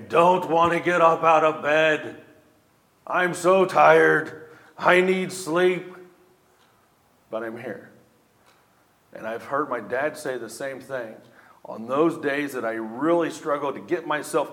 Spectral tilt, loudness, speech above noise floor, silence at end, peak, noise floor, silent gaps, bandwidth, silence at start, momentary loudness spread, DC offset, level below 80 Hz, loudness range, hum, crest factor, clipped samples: -5 dB/octave; -22 LUFS; 39 dB; 0 s; -2 dBFS; -61 dBFS; none; 16.5 kHz; 0 s; 18 LU; under 0.1%; -70 dBFS; 13 LU; none; 22 dB; under 0.1%